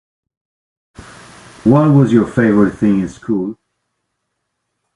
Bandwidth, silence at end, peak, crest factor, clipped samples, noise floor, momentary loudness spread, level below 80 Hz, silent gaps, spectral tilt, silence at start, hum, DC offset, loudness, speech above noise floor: 11 kHz; 1.45 s; 0 dBFS; 16 dB; under 0.1%; -72 dBFS; 10 LU; -46 dBFS; none; -9 dB/octave; 1 s; none; under 0.1%; -13 LUFS; 60 dB